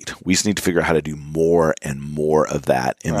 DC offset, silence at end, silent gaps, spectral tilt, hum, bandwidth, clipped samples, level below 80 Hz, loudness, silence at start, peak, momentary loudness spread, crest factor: under 0.1%; 0 s; none; -4.5 dB/octave; none; 15.5 kHz; under 0.1%; -44 dBFS; -19 LUFS; 0 s; -2 dBFS; 7 LU; 18 dB